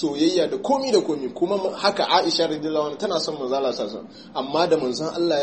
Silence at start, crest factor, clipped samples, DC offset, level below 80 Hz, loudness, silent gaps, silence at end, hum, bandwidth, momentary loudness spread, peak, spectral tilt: 0 s; 18 dB; under 0.1%; under 0.1%; -70 dBFS; -22 LUFS; none; 0 s; none; 8.8 kHz; 8 LU; -4 dBFS; -4 dB/octave